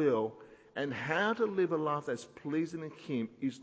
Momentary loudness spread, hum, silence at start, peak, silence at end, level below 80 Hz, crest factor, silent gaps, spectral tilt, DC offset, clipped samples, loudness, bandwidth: 9 LU; none; 0 s; -16 dBFS; 0 s; -76 dBFS; 18 dB; none; -6.5 dB/octave; under 0.1%; under 0.1%; -34 LUFS; 8 kHz